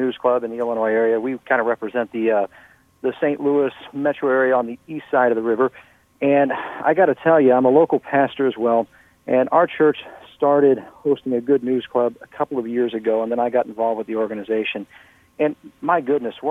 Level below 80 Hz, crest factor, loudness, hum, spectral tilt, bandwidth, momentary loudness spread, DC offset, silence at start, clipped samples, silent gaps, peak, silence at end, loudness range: -66 dBFS; 18 dB; -20 LUFS; none; -8 dB/octave; 3.9 kHz; 9 LU; under 0.1%; 0 s; under 0.1%; none; -2 dBFS; 0 s; 5 LU